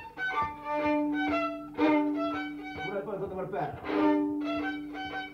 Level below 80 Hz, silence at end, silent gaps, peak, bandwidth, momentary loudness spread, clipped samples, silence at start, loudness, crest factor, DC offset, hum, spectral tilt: -60 dBFS; 0 s; none; -14 dBFS; 6.4 kHz; 10 LU; under 0.1%; 0 s; -31 LUFS; 16 dB; under 0.1%; none; -6.5 dB/octave